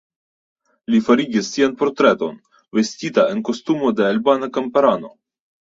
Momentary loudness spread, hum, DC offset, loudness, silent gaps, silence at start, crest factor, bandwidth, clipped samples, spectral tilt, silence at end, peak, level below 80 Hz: 8 LU; none; under 0.1%; -18 LUFS; none; 0.9 s; 18 dB; 7.8 kHz; under 0.1%; -5 dB/octave; 0.5 s; -2 dBFS; -62 dBFS